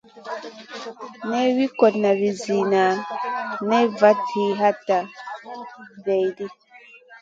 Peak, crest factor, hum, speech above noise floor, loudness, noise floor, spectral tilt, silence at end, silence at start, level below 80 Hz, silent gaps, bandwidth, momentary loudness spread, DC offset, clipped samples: -2 dBFS; 20 dB; none; 27 dB; -21 LUFS; -48 dBFS; -5.5 dB/octave; 0.05 s; 0.15 s; -72 dBFS; none; 7.8 kHz; 18 LU; under 0.1%; under 0.1%